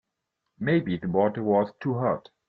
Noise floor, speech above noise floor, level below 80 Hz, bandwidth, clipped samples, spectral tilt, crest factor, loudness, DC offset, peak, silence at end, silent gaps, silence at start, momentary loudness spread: -82 dBFS; 57 dB; -62 dBFS; 5.8 kHz; under 0.1%; -10 dB/octave; 16 dB; -26 LUFS; under 0.1%; -10 dBFS; 0.3 s; none; 0.6 s; 4 LU